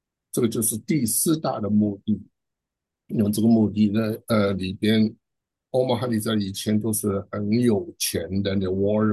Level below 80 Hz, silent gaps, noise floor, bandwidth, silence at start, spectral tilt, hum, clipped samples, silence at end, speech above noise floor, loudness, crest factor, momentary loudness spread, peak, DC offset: -50 dBFS; none; -85 dBFS; 13 kHz; 0.35 s; -5.5 dB/octave; none; under 0.1%; 0 s; 63 dB; -23 LUFS; 14 dB; 6 LU; -8 dBFS; under 0.1%